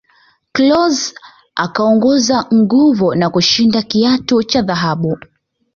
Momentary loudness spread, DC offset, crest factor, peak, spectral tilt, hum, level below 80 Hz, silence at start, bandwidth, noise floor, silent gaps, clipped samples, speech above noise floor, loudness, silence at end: 10 LU; under 0.1%; 12 dB; -2 dBFS; -4.5 dB/octave; none; -50 dBFS; 0.55 s; 7.4 kHz; -53 dBFS; none; under 0.1%; 41 dB; -13 LUFS; 0.6 s